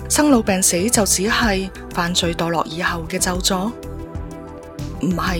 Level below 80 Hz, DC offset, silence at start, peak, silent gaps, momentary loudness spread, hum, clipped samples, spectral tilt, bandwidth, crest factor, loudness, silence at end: -34 dBFS; under 0.1%; 0 s; 0 dBFS; none; 17 LU; none; under 0.1%; -3.5 dB/octave; 18 kHz; 20 dB; -18 LUFS; 0 s